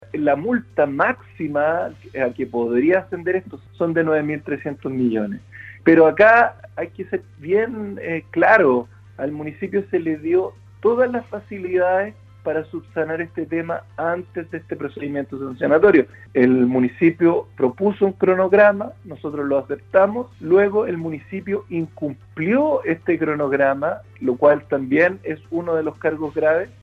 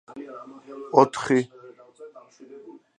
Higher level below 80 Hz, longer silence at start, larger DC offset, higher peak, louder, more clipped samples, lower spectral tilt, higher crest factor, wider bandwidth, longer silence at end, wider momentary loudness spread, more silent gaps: first, -58 dBFS vs -72 dBFS; about the same, 0.15 s vs 0.1 s; neither; about the same, 0 dBFS vs -2 dBFS; about the same, -20 LUFS vs -21 LUFS; neither; first, -9 dB/octave vs -6 dB/octave; second, 18 dB vs 24 dB; second, 6.2 kHz vs 10 kHz; about the same, 0.15 s vs 0.25 s; second, 14 LU vs 26 LU; neither